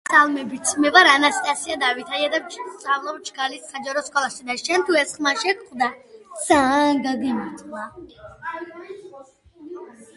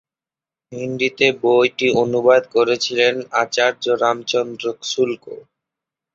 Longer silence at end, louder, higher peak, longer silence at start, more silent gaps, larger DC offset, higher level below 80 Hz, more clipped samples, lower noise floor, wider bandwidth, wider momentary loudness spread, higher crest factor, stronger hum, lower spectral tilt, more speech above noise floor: second, 0.15 s vs 0.75 s; about the same, -20 LUFS vs -18 LUFS; about the same, 0 dBFS vs -2 dBFS; second, 0.1 s vs 0.7 s; neither; neither; about the same, -60 dBFS vs -64 dBFS; neither; second, -46 dBFS vs under -90 dBFS; first, 11.5 kHz vs 7.8 kHz; first, 21 LU vs 13 LU; about the same, 22 dB vs 18 dB; neither; second, -1.5 dB/octave vs -3.5 dB/octave; second, 25 dB vs over 72 dB